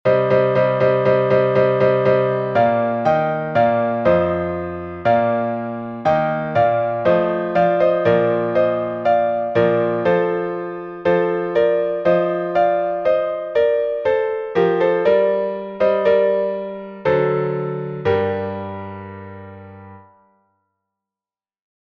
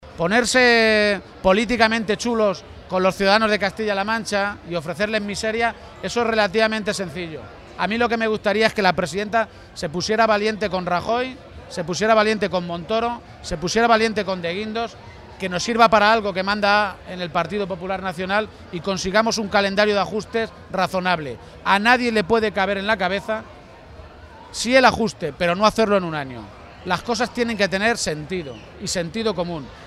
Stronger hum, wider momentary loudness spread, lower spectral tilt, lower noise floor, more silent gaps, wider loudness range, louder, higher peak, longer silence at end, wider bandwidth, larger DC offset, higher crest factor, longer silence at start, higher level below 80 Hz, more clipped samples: neither; second, 10 LU vs 13 LU; first, -8.5 dB/octave vs -4 dB/octave; first, under -90 dBFS vs -42 dBFS; neither; first, 6 LU vs 3 LU; about the same, -18 LUFS vs -20 LUFS; second, -4 dBFS vs 0 dBFS; first, 1.95 s vs 0 s; second, 6.2 kHz vs 14.5 kHz; neither; second, 14 dB vs 20 dB; about the same, 0.05 s vs 0 s; second, -54 dBFS vs -46 dBFS; neither